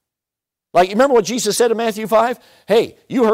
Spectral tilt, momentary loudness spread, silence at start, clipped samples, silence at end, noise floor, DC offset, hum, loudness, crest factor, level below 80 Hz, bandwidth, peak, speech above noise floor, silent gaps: -3.5 dB/octave; 7 LU; 0.75 s; under 0.1%; 0 s; -86 dBFS; under 0.1%; none; -16 LUFS; 12 dB; -54 dBFS; 16 kHz; -4 dBFS; 71 dB; none